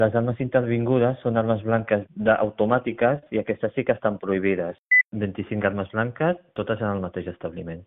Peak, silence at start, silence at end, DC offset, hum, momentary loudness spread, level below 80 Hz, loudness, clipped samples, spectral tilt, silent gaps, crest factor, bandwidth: -4 dBFS; 0 s; 0.05 s; under 0.1%; none; 9 LU; -56 dBFS; -24 LUFS; under 0.1%; -6 dB/octave; 4.78-4.86 s, 5.05-5.10 s; 18 dB; 3.9 kHz